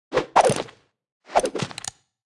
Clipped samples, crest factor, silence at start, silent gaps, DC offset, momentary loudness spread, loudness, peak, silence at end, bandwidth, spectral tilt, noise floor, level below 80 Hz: under 0.1%; 22 dB; 0.1 s; 1.12-1.20 s; under 0.1%; 16 LU; -23 LUFS; -4 dBFS; 0.35 s; 12 kHz; -3.5 dB/octave; -48 dBFS; -56 dBFS